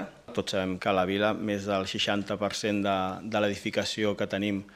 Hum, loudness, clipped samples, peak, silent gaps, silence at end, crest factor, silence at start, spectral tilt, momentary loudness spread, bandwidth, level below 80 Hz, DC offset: none; -29 LUFS; under 0.1%; -10 dBFS; none; 0.05 s; 18 dB; 0 s; -4.5 dB/octave; 4 LU; 15 kHz; -64 dBFS; under 0.1%